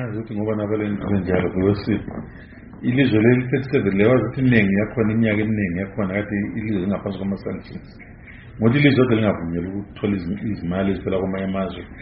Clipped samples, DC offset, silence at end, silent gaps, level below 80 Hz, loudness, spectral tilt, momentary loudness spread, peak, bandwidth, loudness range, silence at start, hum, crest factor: under 0.1%; under 0.1%; 0 s; none; -44 dBFS; -21 LUFS; -7 dB/octave; 14 LU; 0 dBFS; 5.4 kHz; 5 LU; 0 s; none; 20 dB